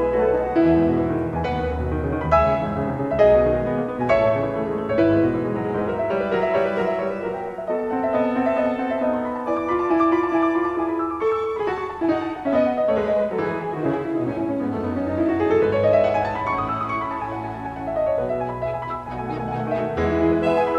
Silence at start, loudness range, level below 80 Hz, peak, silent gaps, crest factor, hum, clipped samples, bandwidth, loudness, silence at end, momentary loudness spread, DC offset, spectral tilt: 0 s; 3 LU; -40 dBFS; -4 dBFS; none; 18 dB; none; under 0.1%; 7.4 kHz; -22 LUFS; 0 s; 8 LU; under 0.1%; -8.5 dB/octave